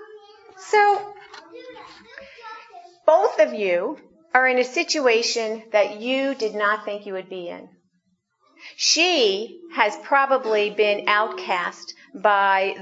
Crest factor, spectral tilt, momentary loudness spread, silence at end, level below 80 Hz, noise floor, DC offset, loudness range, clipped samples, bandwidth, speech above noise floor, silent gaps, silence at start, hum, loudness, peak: 22 dB; -1.5 dB/octave; 22 LU; 0 s; -78 dBFS; -70 dBFS; under 0.1%; 5 LU; under 0.1%; 8 kHz; 48 dB; none; 0 s; none; -20 LUFS; 0 dBFS